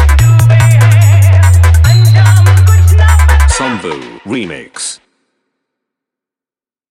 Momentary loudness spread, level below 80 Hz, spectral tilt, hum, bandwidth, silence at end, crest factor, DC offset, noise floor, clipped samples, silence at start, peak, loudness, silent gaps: 14 LU; -14 dBFS; -5.5 dB/octave; none; 14 kHz; 1.95 s; 8 dB; under 0.1%; under -90 dBFS; under 0.1%; 0 s; 0 dBFS; -7 LUFS; none